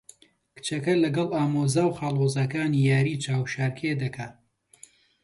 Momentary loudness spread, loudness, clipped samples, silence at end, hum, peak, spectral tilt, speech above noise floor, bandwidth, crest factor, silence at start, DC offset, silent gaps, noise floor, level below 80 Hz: 10 LU; -25 LUFS; under 0.1%; 0.9 s; none; -10 dBFS; -6 dB/octave; 31 dB; 11.5 kHz; 16 dB; 0.55 s; under 0.1%; none; -55 dBFS; -62 dBFS